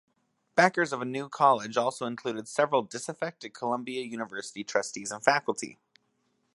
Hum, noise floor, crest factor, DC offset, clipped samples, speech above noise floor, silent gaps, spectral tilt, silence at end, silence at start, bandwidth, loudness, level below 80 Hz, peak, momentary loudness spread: none; -74 dBFS; 26 dB; under 0.1%; under 0.1%; 45 dB; none; -3.5 dB/octave; 0.8 s; 0.55 s; 11.5 kHz; -29 LUFS; -80 dBFS; -2 dBFS; 12 LU